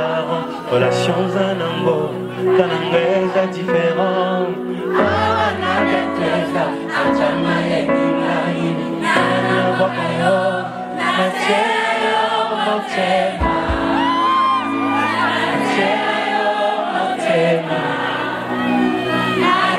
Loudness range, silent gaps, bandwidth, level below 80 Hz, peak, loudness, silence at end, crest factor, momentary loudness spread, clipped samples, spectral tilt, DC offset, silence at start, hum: 1 LU; none; 15 kHz; -42 dBFS; 0 dBFS; -17 LUFS; 0 s; 18 dB; 5 LU; under 0.1%; -5.5 dB/octave; under 0.1%; 0 s; none